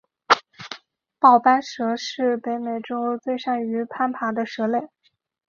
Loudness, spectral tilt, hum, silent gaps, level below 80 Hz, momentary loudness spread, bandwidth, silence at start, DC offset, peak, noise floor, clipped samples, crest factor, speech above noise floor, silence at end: -22 LUFS; -4 dB/octave; none; none; -72 dBFS; 12 LU; 7.4 kHz; 0.3 s; under 0.1%; -2 dBFS; -42 dBFS; under 0.1%; 20 dB; 21 dB; 0.65 s